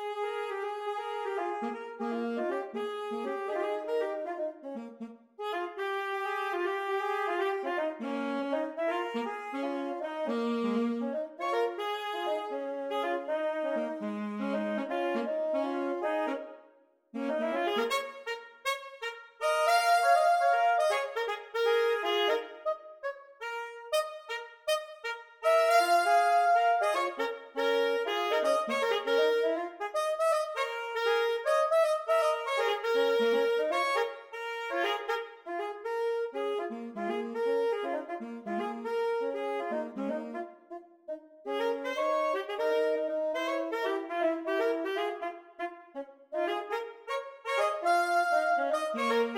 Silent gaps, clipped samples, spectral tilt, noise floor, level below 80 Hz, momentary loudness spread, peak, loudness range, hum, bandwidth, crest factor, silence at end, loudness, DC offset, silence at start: none; under 0.1%; -3.5 dB/octave; -63 dBFS; -84 dBFS; 12 LU; -12 dBFS; 7 LU; none; 17.5 kHz; 18 dB; 0 s; -31 LUFS; under 0.1%; 0 s